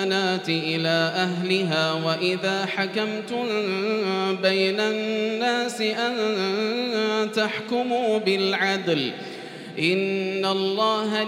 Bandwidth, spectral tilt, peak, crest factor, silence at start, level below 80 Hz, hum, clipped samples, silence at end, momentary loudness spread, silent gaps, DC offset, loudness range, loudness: 16 kHz; -4.5 dB/octave; -8 dBFS; 16 dB; 0 s; -80 dBFS; none; under 0.1%; 0 s; 4 LU; none; under 0.1%; 1 LU; -23 LUFS